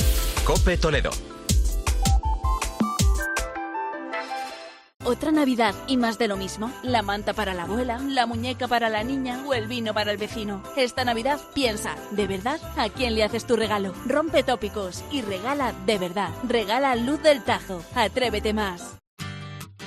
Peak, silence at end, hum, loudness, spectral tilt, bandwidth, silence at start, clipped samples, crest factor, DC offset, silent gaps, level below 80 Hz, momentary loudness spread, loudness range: -6 dBFS; 0 s; none; -25 LUFS; -4.5 dB/octave; 15.5 kHz; 0 s; under 0.1%; 18 dB; under 0.1%; 4.96-5.00 s, 19.07-19.17 s; -32 dBFS; 9 LU; 2 LU